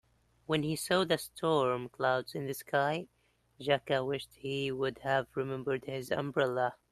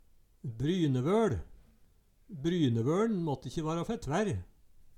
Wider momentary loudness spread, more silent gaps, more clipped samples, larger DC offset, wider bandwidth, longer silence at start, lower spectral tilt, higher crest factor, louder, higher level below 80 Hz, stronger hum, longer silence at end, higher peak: second, 8 LU vs 12 LU; neither; neither; neither; about the same, 13 kHz vs 13.5 kHz; about the same, 0.5 s vs 0.45 s; second, -5 dB/octave vs -7 dB/octave; about the same, 18 dB vs 16 dB; about the same, -33 LUFS vs -32 LUFS; second, -68 dBFS vs -54 dBFS; neither; first, 0.2 s vs 0.05 s; first, -14 dBFS vs -18 dBFS